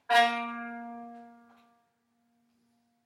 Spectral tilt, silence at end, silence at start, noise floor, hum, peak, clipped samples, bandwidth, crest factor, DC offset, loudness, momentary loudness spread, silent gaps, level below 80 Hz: -1.5 dB/octave; 1.75 s; 0.1 s; -74 dBFS; none; -10 dBFS; under 0.1%; 15 kHz; 22 dB; under 0.1%; -29 LUFS; 24 LU; none; under -90 dBFS